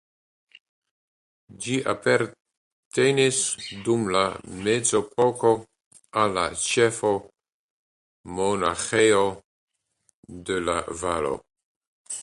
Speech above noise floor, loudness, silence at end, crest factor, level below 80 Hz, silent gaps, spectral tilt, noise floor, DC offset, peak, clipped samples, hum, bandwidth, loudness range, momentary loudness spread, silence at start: 46 dB; -24 LUFS; 0 s; 20 dB; -56 dBFS; 2.40-2.45 s, 2.57-2.91 s, 5.86-5.91 s, 7.54-8.24 s, 9.44-9.68 s, 10.13-10.23 s, 11.64-11.81 s, 11.87-12.05 s; -3.5 dB/octave; -70 dBFS; under 0.1%; -6 dBFS; under 0.1%; none; 11.5 kHz; 3 LU; 10 LU; 1.5 s